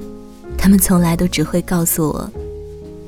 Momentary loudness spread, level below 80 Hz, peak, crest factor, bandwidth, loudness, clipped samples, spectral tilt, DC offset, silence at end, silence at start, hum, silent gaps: 21 LU; -30 dBFS; -2 dBFS; 16 dB; 18.5 kHz; -15 LUFS; under 0.1%; -5 dB/octave; under 0.1%; 0 s; 0 s; none; none